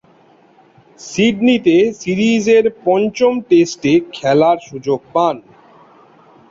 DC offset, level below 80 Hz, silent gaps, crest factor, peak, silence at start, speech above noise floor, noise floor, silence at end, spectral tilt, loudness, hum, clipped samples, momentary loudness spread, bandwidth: under 0.1%; -56 dBFS; none; 14 dB; -2 dBFS; 1 s; 35 dB; -49 dBFS; 1.1 s; -5.5 dB/octave; -14 LUFS; none; under 0.1%; 8 LU; 7.8 kHz